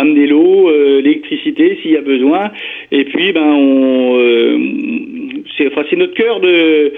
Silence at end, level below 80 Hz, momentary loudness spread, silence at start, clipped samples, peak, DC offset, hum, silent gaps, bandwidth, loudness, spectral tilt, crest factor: 0 s; -60 dBFS; 11 LU; 0 s; under 0.1%; 0 dBFS; under 0.1%; none; none; 3.9 kHz; -11 LUFS; -7.5 dB/octave; 10 dB